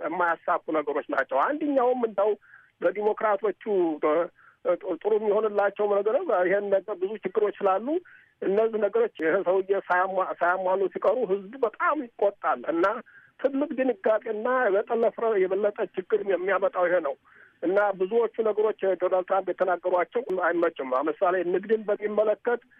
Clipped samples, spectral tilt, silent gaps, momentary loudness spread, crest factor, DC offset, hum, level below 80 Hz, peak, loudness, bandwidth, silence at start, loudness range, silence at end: under 0.1%; -8 dB/octave; none; 4 LU; 14 dB; under 0.1%; none; -78 dBFS; -12 dBFS; -26 LUFS; 4.5 kHz; 0 s; 1 LU; 0.2 s